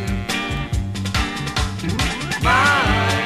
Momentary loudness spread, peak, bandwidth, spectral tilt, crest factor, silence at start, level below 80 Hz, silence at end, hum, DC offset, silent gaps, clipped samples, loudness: 9 LU; -4 dBFS; 15.5 kHz; -4 dB/octave; 16 dB; 0 s; -28 dBFS; 0 s; none; under 0.1%; none; under 0.1%; -19 LUFS